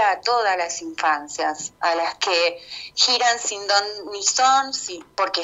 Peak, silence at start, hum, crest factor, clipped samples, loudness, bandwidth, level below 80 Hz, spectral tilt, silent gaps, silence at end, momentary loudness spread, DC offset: -4 dBFS; 0 s; none; 18 dB; under 0.1%; -21 LUFS; 8.6 kHz; -66 dBFS; 1 dB/octave; none; 0 s; 10 LU; under 0.1%